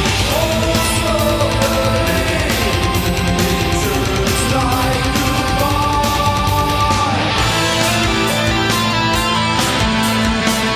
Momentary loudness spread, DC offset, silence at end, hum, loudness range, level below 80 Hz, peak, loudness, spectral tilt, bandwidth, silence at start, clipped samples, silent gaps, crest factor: 2 LU; under 0.1%; 0 s; none; 1 LU; -26 dBFS; -2 dBFS; -15 LUFS; -4 dB/octave; 16 kHz; 0 s; under 0.1%; none; 14 dB